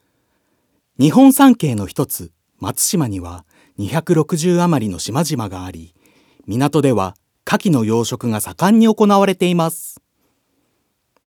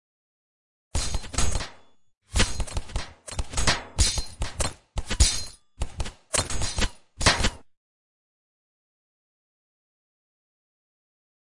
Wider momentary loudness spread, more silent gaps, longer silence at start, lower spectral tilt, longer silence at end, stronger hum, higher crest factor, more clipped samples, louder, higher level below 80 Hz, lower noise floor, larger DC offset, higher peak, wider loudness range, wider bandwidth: first, 17 LU vs 14 LU; neither; about the same, 1 s vs 0.9 s; first, -5.5 dB/octave vs -2.5 dB/octave; second, 1.45 s vs 3.7 s; neither; second, 16 dB vs 24 dB; neither; first, -16 LUFS vs -27 LUFS; second, -58 dBFS vs -34 dBFS; first, -67 dBFS vs -54 dBFS; neither; first, 0 dBFS vs -4 dBFS; about the same, 4 LU vs 4 LU; first, 20 kHz vs 11.5 kHz